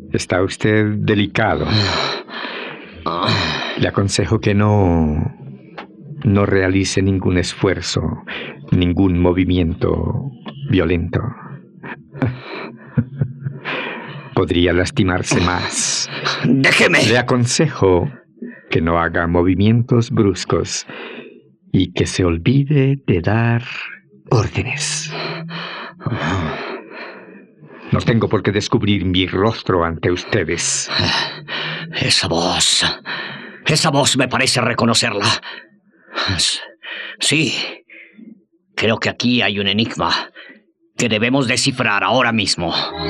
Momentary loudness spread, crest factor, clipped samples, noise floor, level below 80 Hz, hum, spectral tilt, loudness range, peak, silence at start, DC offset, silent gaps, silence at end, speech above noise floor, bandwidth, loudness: 14 LU; 16 dB; under 0.1%; -48 dBFS; -44 dBFS; none; -4.5 dB/octave; 7 LU; -2 dBFS; 0 s; under 0.1%; none; 0 s; 31 dB; 13 kHz; -17 LUFS